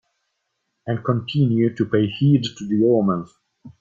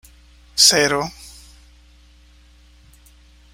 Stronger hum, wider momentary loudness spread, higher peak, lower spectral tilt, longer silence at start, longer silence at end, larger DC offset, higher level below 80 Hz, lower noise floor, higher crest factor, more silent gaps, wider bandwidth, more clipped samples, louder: second, none vs 60 Hz at -50 dBFS; second, 9 LU vs 20 LU; second, -6 dBFS vs 0 dBFS; first, -8 dB/octave vs -1 dB/octave; first, 0.85 s vs 0.55 s; second, 0.1 s vs 2.25 s; neither; second, -58 dBFS vs -48 dBFS; first, -75 dBFS vs -50 dBFS; second, 16 dB vs 24 dB; neither; second, 7.4 kHz vs 16 kHz; neither; second, -20 LUFS vs -15 LUFS